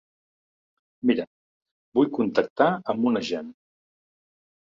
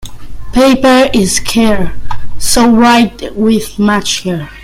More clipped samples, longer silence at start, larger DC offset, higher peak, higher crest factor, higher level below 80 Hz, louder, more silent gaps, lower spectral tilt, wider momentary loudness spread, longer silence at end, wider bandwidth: neither; first, 1.05 s vs 0 s; neither; second, -6 dBFS vs 0 dBFS; first, 22 dB vs 10 dB; second, -68 dBFS vs -28 dBFS; second, -25 LUFS vs -10 LUFS; first, 1.27-1.61 s, 1.71-1.92 s, 2.50-2.56 s vs none; first, -6.5 dB/octave vs -4 dB/octave; about the same, 10 LU vs 11 LU; first, 1.2 s vs 0 s; second, 7.4 kHz vs 16 kHz